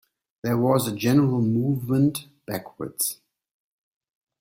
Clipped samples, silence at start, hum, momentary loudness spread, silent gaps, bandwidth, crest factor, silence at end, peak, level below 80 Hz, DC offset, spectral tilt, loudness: under 0.1%; 0.45 s; none; 13 LU; none; 16.5 kHz; 18 dB; 1.25 s; -8 dBFS; -60 dBFS; under 0.1%; -6 dB/octave; -24 LUFS